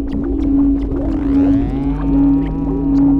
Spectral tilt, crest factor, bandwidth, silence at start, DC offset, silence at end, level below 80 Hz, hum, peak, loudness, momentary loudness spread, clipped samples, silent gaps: -10.5 dB/octave; 10 dB; 3.9 kHz; 0 s; under 0.1%; 0 s; -22 dBFS; none; -4 dBFS; -16 LUFS; 5 LU; under 0.1%; none